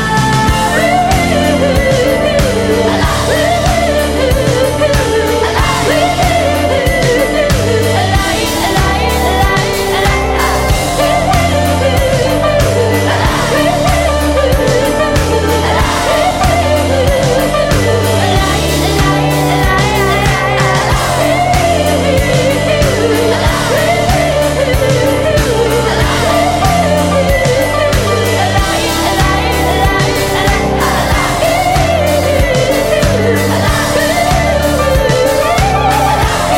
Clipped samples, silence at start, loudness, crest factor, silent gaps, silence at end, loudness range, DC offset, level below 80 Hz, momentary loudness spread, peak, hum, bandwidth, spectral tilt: under 0.1%; 0 s; -11 LUFS; 10 dB; none; 0 s; 1 LU; under 0.1%; -20 dBFS; 1 LU; 0 dBFS; none; 16.5 kHz; -4.5 dB/octave